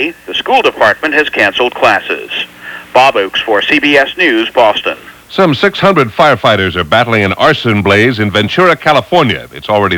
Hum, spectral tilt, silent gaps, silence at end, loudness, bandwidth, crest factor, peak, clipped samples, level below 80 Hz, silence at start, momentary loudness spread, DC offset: none; -5.5 dB/octave; none; 0 s; -10 LUFS; 20 kHz; 10 dB; 0 dBFS; 0.9%; -44 dBFS; 0 s; 8 LU; under 0.1%